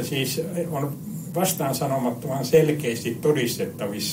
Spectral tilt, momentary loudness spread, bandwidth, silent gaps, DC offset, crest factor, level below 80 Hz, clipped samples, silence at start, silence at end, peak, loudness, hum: -5 dB/octave; 9 LU; 16 kHz; none; under 0.1%; 18 dB; -64 dBFS; under 0.1%; 0 s; 0 s; -6 dBFS; -24 LUFS; none